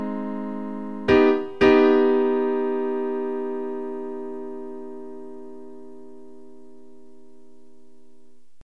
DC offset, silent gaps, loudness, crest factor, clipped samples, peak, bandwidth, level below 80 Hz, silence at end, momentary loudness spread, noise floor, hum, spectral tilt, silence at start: 1%; none; -22 LUFS; 20 dB; under 0.1%; -4 dBFS; 6.2 kHz; -56 dBFS; 2.25 s; 23 LU; -61 dBFS; none; -7 dB/octave; 0 s